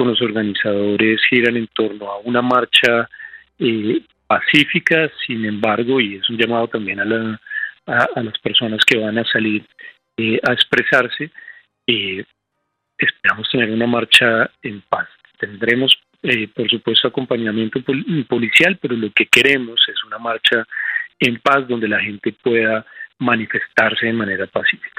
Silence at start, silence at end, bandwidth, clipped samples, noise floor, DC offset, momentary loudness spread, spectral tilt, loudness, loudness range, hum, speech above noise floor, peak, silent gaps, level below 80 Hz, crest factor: 0 s; 0.1 s; 15 kHz; under 0.1%; -73 dBFS; under 0.1%; 11 LU; -4.5 dB/octave; -16 LUFS; 3 LU; none; 56 dB; 0 dBFS; none; -60 dBFS; 18 dB